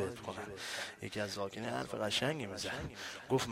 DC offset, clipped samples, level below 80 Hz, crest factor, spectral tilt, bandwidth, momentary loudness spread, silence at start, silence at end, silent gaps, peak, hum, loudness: under 0.1%; under 0.1%; -64 dBFS; 20 dB; -4 dB/octave; 16 kHz; 10 LU; 0 s; 0 s; none; -20 dBFS; none; -39 LUFS